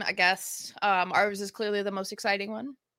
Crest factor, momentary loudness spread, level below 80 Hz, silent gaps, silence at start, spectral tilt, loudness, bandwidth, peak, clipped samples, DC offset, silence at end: 20 dB; 10 LU; -76 dBFS; none; 0 s; -2.5 dB/octave; -28 LUFS; 16.5 kHz; -10 dBFS; under 0.1%; under 0.1%; 0.25 s